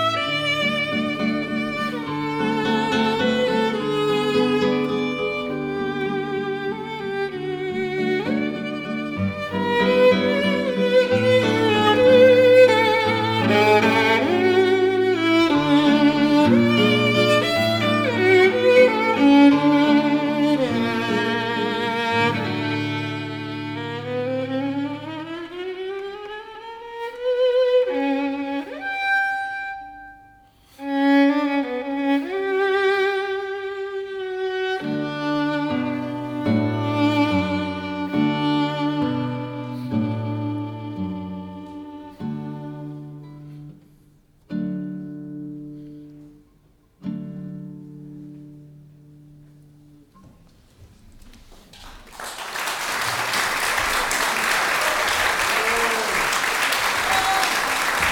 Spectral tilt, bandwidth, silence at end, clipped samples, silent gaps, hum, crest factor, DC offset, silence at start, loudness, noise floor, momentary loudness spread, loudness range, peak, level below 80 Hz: -4.5 dB/octave; 18 kHz; 0 s; under 0.1%; none; none; 18 dB; under 0.1%; 0 s; -20 LUFS; -57 dBFS; 17 LU; 18 LU; -4 dBFS; -54 dBFS